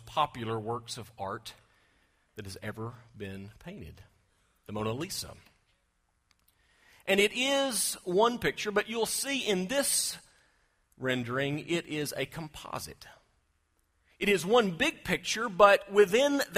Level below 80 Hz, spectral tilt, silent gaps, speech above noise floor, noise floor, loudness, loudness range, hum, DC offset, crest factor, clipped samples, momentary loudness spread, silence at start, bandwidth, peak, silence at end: -62 dBFS; -3 dB/octave; none; 45 dB; -75 dBFS; -29 LUFS; 14 LU; none; under 0.1%; 24 dB; under 0.1%; 20 LU; 0 s; 15.5 kHz; -6 dBFS; 0 s